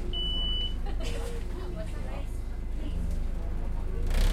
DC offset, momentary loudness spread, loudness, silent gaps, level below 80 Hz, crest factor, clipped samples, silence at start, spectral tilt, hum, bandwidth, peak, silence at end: under 0.1%; 8 LU; -35 LUFS; none; -30 dBFS; 12 dB; under 0.1%; 0 s; -5 dB/octave; none; 13 kHz; -16 dBFS; 0 s